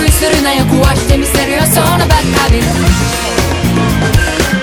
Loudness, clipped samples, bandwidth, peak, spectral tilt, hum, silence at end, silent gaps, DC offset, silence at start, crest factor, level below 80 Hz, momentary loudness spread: -10 LUFS; 0.3%; over 20 kHz; 0 dBFS; -4.5 dB/octave; none; 0 s; none; under 0.1%; 0 s; 10 dB; -18 dBFS; 3 LU